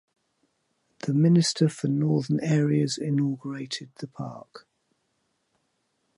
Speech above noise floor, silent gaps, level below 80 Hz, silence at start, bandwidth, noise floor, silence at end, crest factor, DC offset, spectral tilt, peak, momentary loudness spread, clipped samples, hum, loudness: 50 dB; none; -72 dBFS; 1.05 s; 11.5 kHz; -74 dBFS; 1.6 s; 18 dB; under 0.1%; -6 dB/octave; -10 dBFS; 17 LU; under 0.1%; none; -25 LUFS